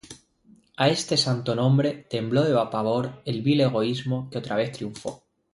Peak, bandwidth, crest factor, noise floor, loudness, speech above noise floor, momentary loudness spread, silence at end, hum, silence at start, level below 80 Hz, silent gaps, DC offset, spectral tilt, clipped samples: -8 dBFS; 11.5 kHz; 18 dB; -58 dBFS; -24 LUFS; 34 dB; 9 LU; 0.4 s; none; 0.05 s; -62 dBFS; none; under 0.1%; -5.5 dB/octave; under 0.1%